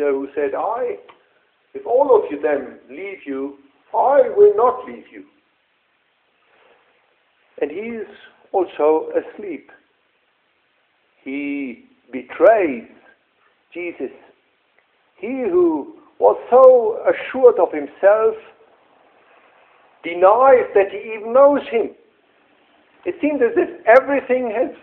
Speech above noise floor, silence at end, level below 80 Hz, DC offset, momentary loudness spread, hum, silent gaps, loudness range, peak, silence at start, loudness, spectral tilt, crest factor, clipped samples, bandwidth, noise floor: 47 dB; 0.05 s; -64 dBFS; under 0.1%; 20 LU; none; none; 10 LU; 0 dBFS; 0 s; -17 LUFS; -7.5 dB/octave; 18 dB; under 0.1%; 3.9 kHz; -64 dBFS